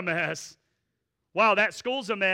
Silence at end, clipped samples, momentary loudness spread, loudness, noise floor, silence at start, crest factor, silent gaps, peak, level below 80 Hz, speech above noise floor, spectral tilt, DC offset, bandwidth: 0 s; under 0.1%; 15 LU; -25 LUFS; -80 dBFS; 0 s; 16 dB; none; -12 dBFS; -72 dBFS; 54 dB; -3.5 dB/octave; under 0.1%; 16 kHz